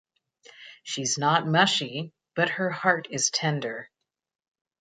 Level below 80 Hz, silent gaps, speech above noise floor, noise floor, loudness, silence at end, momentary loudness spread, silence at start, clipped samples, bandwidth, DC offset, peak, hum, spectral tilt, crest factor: -74 dBFS; none; 30 dB; -56 dBFS; -25 LUFS; 0.95 s; 14 LU; 0.6 s; under 0.1%; 9.4 kHz; under 0.1%; -6 dBFS; none; -3 dB/octave; 22 dB